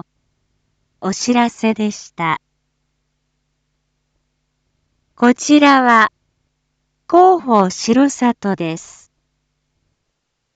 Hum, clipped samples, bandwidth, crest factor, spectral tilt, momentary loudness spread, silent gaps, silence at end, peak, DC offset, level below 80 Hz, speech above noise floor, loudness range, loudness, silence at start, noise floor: none; under 0.1%; 9 kHz; 18 dB; -4.5 dB/octave; 13 LU; none; 1.75 s; 0 dBFS; under 0.1%; -62 dBFS; 59 dB; 11 LU; -14 LUFS; 1 s; -72 dBFS